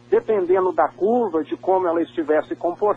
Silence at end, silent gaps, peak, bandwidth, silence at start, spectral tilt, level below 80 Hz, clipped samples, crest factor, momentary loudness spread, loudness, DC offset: 0 s; none; -6 dBFS; 4.4 kHz; 0.1 s; -8 dB/octave; -64 dBFS; under 0.1%; 14 dB; 5 LU; -21 LUFS; under 0.1%